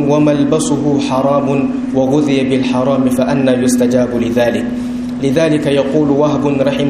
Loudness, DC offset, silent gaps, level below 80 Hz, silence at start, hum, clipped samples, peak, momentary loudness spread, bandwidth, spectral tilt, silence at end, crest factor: -13 LUFS; under 0.1%; none; -42 dBFS; 0 s; none; under 0.1%; 0 dBFS; 4 LU; 14 kHz; -6 dB/octave; 0 s; 12 dB